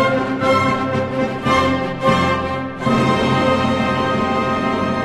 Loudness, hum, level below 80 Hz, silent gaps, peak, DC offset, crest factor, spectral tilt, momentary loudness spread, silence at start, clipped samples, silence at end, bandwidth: -17 LUFS; none; -38 dBFS; none; -2 dBFS; under 0.1%; 16 dB; -6 dB/octave; 4 LU; 0 s; under 0.1%; 0 s; 12.5 kHz